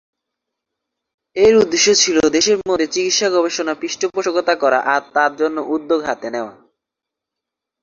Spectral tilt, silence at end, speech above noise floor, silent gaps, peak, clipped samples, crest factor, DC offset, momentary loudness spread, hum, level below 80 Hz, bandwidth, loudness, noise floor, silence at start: -2 dB/octave; 1.3 s; 67 dB; none; -2 dBFS; under 0.1%; 16 dB; under 0.1%; 10 LU; none; -56 dBFS; 7.6 kHz; -16 LUFS; -83 dBFS; 1.35 s